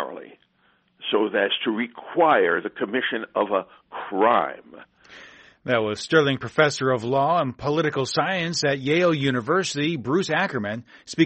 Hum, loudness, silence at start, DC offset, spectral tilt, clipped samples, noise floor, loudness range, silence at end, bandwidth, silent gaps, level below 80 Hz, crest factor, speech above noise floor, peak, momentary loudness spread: none; -23 LUFS; 0 s; under 0.1%; -5 dB/octave; under 0.1%; -64 dBFS; 2 LU; 0 s; 8.4 kHz; none; -62 dBFS; 20 dB; 41 dB; -2 dBFS; 11 LU